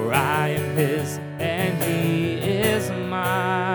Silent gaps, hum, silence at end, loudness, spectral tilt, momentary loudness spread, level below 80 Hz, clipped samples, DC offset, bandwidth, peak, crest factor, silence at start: none; none; 0 s; -23 LUFS; -5.5 dB/octave; 5 LU; -56 dBFS; under 0.1%; under 0.1%; 19.5 kHz; -4 dBFS; 20 dB; 0 s